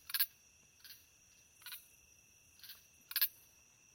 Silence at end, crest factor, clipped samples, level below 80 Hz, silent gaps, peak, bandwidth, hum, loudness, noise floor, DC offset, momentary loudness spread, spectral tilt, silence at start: 0.6 s; 28 dB; under 0.1%; -82 dBFS; none; -16 dBFS; 17.5 kHz; none; -38 LUFS; -67 dBFS; under 0.1%; 24 LU; 2.5 dB/octave; 0.1 s